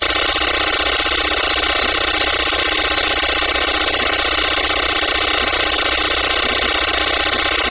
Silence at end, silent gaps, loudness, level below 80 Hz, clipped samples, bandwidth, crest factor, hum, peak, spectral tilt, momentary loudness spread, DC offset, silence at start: 0 s; none; -15 LUFS; -34 dBFS; under 0.1%; 4 kHz; 14 dB; none; -4 dBFS; -6.5 dB/octave; 0 LU; 0.9%; 0 s